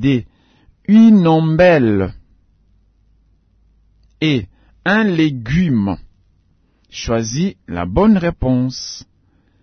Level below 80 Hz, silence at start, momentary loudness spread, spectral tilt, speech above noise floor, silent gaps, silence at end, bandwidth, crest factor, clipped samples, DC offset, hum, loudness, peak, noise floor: -38 dBFS; 0 s; 17 LU; -6.5 dB/octave; 43 dB; none; 0.6 s; 6.6 kHz; 16 dB; under 0.1%; under 0.1%; none; -15 LUFS; -2 dBFS; -57 dBFS